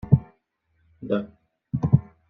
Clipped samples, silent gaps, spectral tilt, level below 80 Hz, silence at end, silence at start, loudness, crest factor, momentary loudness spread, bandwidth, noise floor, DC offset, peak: under 0.1%; none; -11.5 dB/octave; -48 dBFS; 0.3 s; 0.05 s; -25 LUFS; 22 dB; 18 LU; 3.9 kHz; -70 dBFS; under 0.1%; -2 dBFS